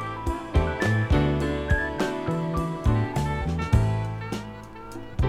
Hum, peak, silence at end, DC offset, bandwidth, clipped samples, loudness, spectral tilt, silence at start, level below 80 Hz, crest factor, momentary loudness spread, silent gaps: none; -6 dBFS; 0 s; under 0.1%; 13.5 kHz; under 0.1%; -26 LUFS; -7 dB/octave; 0 s; -32 dBFS; 18 dB; 12 LU; none